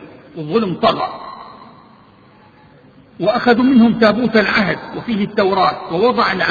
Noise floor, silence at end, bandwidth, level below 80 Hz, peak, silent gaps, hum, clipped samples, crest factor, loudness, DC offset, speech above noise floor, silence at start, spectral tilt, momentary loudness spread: -46 dBFS; 0 s; 7 kHz; -50 dBFS; 0 dBFS; none; none; under 0.1%; 16 dB; -15 LUFS; under 0.1%; 32 dB; 0 s; -7 dB/octave; 15 LU